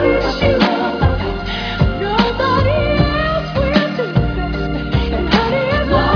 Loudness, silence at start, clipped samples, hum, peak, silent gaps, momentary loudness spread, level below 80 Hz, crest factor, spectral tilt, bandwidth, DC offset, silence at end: -16 LUFS; 0 s; under 0.1%; none; 0 dBFS; none; 6 LU; -24 dBFS; 16 dB; -7.5 dB/octave; 5.4 kHz; under 0.1%; 0 s